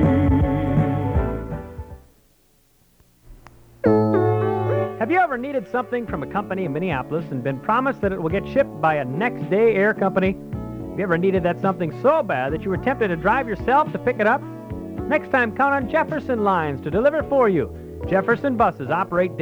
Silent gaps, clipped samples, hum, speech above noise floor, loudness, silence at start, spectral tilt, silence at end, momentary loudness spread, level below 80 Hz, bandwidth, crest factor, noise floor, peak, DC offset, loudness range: none; under 0.1%; none; 38 dB; -21 LUFS; 0 s; -9 dB/octave; 0 s; 8 LU; -38 dBFS; over 20 kHz; 16 dB; -59 dBFS; -4 dBFS; under 0.1%; 3 LU